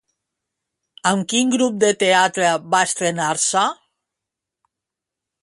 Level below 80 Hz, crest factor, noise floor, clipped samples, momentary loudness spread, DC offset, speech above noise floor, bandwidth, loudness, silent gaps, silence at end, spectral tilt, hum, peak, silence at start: -68 dBFS; 18 dB; -85 dBFS; under 0.1%; 5 LU; under 0.1%; 67 dB; 11.5 kHz; -18 LUFS; none; 1.7 s; -2.5 dB/octave; none; -2 dBFS; 1.05 s